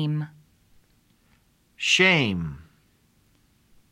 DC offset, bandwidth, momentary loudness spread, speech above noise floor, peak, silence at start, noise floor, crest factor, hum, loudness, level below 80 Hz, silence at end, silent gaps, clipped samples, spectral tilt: under 0.1%; 13 kHz; 21 LU; 40 dB; -6 dBFS; 0 s; -63 dBFS; 22 dB; none; -21 LUFS; -56 dBFS; 1.3 s; none; under 0.1%; -4 dB/octave